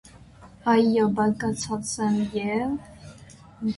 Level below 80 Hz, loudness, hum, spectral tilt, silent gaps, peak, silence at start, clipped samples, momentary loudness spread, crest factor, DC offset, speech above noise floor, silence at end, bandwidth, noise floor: -54 dBFS; -25 LUFS; none; -5.5 dB/octave; none; -8 dBFS; 0.15 s; under 0.1%; 16 LU; 16 dB; under 0.1%; 25 dB; 0 s; 11.5 kHz; -48 dBFS